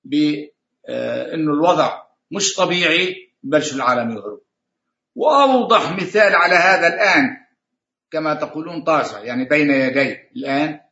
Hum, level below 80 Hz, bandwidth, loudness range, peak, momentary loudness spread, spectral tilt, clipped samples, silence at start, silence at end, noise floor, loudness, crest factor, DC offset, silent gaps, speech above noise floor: none; -70 dBFS; 8 kHz; 5 LU; 0 dBFS; 13 LU; -3.5 dB/octave; under 0.1%; 0.05 s; 0.15 s; -81 dBFS; -17 LUFS; 18 dB; under 0.1%; none; 64 dB